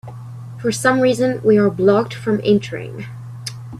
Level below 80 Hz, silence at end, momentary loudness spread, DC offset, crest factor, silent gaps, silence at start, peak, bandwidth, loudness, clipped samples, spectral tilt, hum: -54 dBFS; 0 s; 17 LU; under 0.1%; 16 dB; none; 0.05 s; -2 dBFS; 13.5 kHz; -16 LUFS; under 0.1%; -6 dB/octave; none